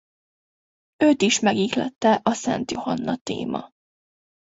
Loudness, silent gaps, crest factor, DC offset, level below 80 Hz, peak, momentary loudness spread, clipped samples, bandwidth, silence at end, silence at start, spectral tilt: -22 LUFS; 3.21-3.25 s; 18 dB; under 0.1%; -62 dBFS; -6 dBFS; 10 LU; under 0.1%; 8 kHz; 0.85 s; 1 s; -4 dB/octave